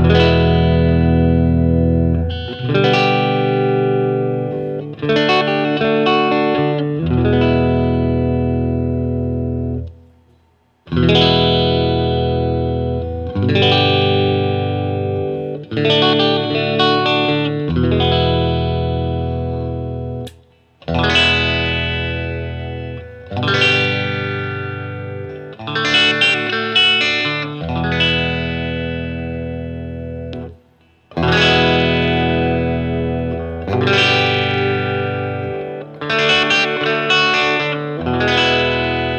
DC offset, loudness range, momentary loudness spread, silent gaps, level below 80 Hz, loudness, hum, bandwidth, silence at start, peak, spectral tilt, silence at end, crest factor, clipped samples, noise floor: under 0.1%; 4 LU; 13 LU; none; -36 dBFS; -16 LUFS; none; 8.6 kHz; 0 s; 0 dBFS; -6 dB/octave; 0 s; 16 dB; under 0.1%; -56 dBFS